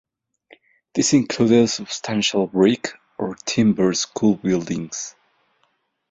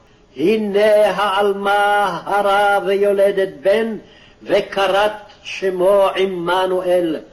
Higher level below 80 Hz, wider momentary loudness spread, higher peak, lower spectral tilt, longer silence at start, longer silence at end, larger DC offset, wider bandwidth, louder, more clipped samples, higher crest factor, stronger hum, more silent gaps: second, -58 dBFS vs -52 dBFS; first, 12 LU vs 7 LU; about the same, -4 dBFS vs -4 dBFS; about the same, -4.5 dB/octave vs -5 dB/octave; first, 0.95 s vs 0.35 s; first, 1 s vs 0.1 s; neither; second, 8.4 kHz vs 13 kHz; second, -20 LUFS vs -16 LUFS; neither; about the same, 18 dB vs 14 dB; neither; neither